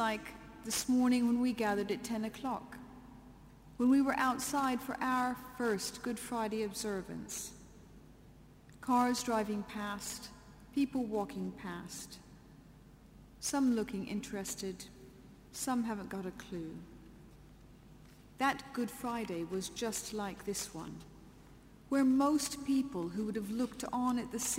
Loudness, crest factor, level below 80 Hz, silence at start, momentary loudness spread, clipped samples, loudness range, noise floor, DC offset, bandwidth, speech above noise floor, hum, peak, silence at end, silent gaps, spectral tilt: -36 LUFS; 18 dB; -62 dBFS; 0 s; 19 LU; under 0.1%; 7 LU; -58 dBFS; under 0.1%; 16 kHz; 23 dB; none; -20 dBFS; 0 s; none; -4 dB/octave